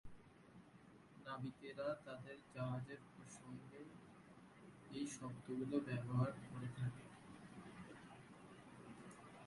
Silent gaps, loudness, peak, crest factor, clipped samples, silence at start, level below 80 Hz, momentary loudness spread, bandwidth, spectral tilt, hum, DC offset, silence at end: none; -49 LUFS; -28 dBFS; 22 dB; under 0.1%; 0.05 s; -76 dBFS; 20 LU; 11.5 kHz; -6.5 dB/octave; none; under 0.1%; 0 s